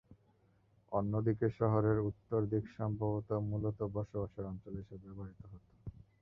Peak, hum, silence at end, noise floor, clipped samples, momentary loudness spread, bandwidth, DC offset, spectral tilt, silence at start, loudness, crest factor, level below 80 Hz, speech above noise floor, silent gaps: -18 dBFS; none; 0.2 s; -71 dBFS; under 0.1%; 20 LU; 3.8 kHz; under 0.1%; -11 dB/octave; 0.1 s; -37 LUFS; 20 dB; -58 dBFS; 34 dB; none